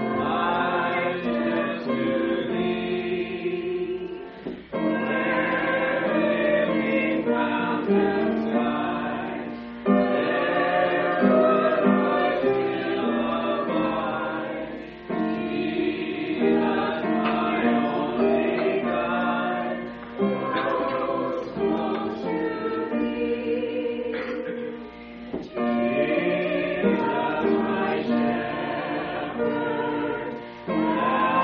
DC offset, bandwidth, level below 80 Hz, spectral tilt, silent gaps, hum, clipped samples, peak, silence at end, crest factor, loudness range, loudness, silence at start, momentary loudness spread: under 0.1%; 5.6 kHz; -56 dBFS; -4 dB/octave; none; none; under 0.1%; -8 dBFS; 0 s; 16 dB; 5 LU; -25 LUFS; 0 s; 9 LU